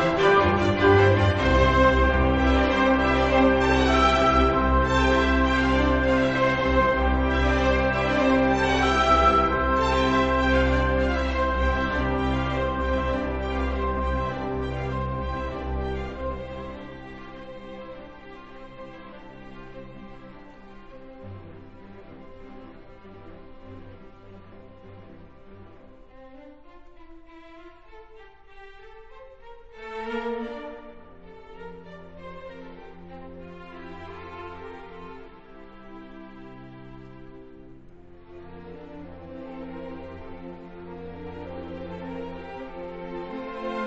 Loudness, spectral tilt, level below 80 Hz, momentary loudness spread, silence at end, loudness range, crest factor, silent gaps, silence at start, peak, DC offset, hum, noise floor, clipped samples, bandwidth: -22 LUFS; -6.5 dB/octave; -34 dBFS; 25 LU; 0 s; 25 LU; 20 dB; none; 0 s; -6 dBFS; 0.2%; none; -49 dBFS; under 0.1%; 8.2 kHz